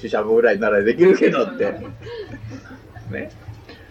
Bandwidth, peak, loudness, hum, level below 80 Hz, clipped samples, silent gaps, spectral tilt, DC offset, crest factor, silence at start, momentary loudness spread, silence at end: 7.8 kHz; -2 dBFS; -17 LUFS; none; -50 dBFS; under 0.1%; none; -7 dB/octave; under 0.1%; 16 dB; 0 s; 23 LU; 0.15 s